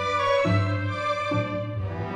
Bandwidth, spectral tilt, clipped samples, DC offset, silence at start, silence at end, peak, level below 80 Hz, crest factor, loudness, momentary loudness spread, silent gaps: 9.4 kHz; -6.5 dB/octave; under 0.1%; under 0.1%; 0 s; 0 s; -10 dBFS; -52 dBFS; 14 dB; -25 LUFS; 8 LU; none